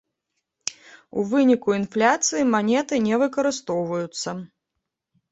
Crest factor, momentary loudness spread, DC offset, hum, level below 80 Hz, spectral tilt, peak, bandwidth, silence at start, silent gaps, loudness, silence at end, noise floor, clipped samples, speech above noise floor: 20 dB; 13 LU; under 0.1%; none; -66 dBFS; -4 dB/octave; -4 dBFS; 8.2 kHz; 0.65 s; none; -22 LUFS; 0.85 s; -81 dBFS; under 0.1%; 60 dB